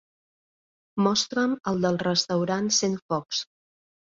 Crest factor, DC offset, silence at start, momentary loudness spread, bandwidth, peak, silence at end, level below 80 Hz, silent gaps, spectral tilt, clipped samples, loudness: 20 dB; under 0.1%; 0.95 s; 8 LU; 7.8 kHz; -8 dBFS; 0.75 s; -66 dBFS; 3.02-3.09 s; -4 dB/octave; under 0.1%; -25 LUFS